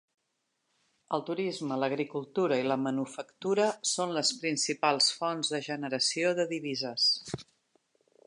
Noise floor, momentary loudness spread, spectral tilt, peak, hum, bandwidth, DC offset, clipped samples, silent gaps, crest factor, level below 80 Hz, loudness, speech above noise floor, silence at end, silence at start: -80 dBFS; 8 LU; -3 dB/octave; -12 dBFS; none; 11 kHz; under 0.1%; under 0.1%; none; 20 dB; -76 dBFS; -30 LUFS; 50 dB; 0.85 s; 1.1 s